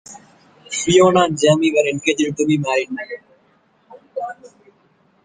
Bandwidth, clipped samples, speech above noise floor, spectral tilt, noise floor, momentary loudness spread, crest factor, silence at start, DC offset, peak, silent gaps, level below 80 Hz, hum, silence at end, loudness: 9.8 kHz; under 0.1%; 41 dB; -4.5 dB/octave; -58 dBFS; 18 LU; 18 dB; 0.1 s; under 0.1%; -2 dBFS; none; -56 dBFS; none; 0.8 s; -17 LUFS